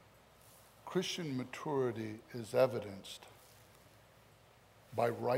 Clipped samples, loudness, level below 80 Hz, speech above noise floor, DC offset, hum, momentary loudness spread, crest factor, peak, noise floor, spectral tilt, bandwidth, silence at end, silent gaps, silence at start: under 0.1%; -38 LUFS; -76 dBFS; 27 dB; under 0.1%; none; 21 LU; 22 dB; -18 dBFS; -64 dBFS; -5.5 dB/octave; 16 kHz; 0 s; none; 0.45 s